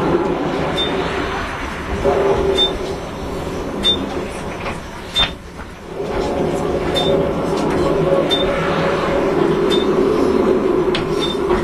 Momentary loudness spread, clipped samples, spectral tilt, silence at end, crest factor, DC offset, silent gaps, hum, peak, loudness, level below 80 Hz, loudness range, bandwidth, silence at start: 10 LU; under 0.1%; -5.5 dB/octave; 0 s; 16 dB; under 0.1%; none; none; -2 dBFS; -18 LUFS; -34 dBFS; 5 LU; 13.5 kHz; 0 s